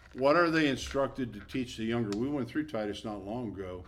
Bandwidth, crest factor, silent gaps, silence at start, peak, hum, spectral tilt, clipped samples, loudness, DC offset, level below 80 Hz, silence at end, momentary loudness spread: 14 kHz; 18 dB; none; 0 s; -12 dBFS; none; -5.5 dB/octave; under 0.1%; -32 LUFS; under 0.1%; -54 dBFS; 0 s; 13 LU